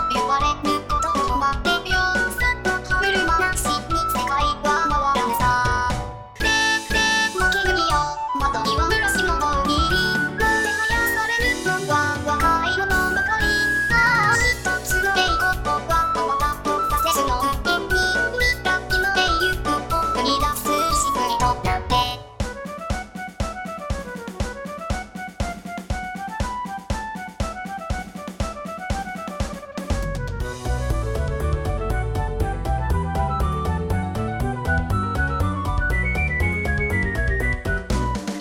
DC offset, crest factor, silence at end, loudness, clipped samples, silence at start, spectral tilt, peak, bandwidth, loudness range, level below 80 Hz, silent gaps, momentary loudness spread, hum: under 0.1%; 16 dB; 0 s; -21 LUFS; under 0.1%; 0 s; -4 dB/octave; -6 dBFS; 18 kHz; 11 LU; -30 dBFS; none; 11 LU; none